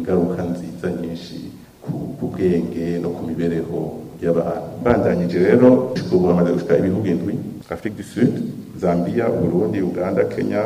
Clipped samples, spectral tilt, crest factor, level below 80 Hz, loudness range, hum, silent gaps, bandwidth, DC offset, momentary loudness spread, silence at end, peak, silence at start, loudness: under 0.1%; -8.5 dB/octave; 18 dB; -48 dBFS; 7 LU; none; none; 15.5 kHz; under 0.1%; 12 LU; 0 s; -2 dBFS; 0 s; -20 LUFS